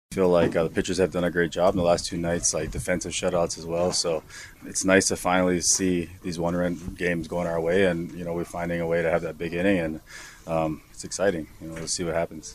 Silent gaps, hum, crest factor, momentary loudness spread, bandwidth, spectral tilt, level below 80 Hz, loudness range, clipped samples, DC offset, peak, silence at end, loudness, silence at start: none; none; 22 dB; 11 LU; 15 kHz; -4 dB/octave; -48 dBFS; 4 LU; under 0.1%; under 0.1%; -4 dBFS; 0 s; -25 LUFS; 0.1 s